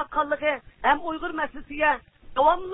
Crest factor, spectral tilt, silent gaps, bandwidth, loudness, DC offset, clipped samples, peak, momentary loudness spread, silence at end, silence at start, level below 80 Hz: 18 dB; -8 dB/octave; none; 4 kHz; -25 LUFS; under 0.1%; under 0.1%; -8 dBFS; 9 LU; 0 s; 0 s; -50 dBFS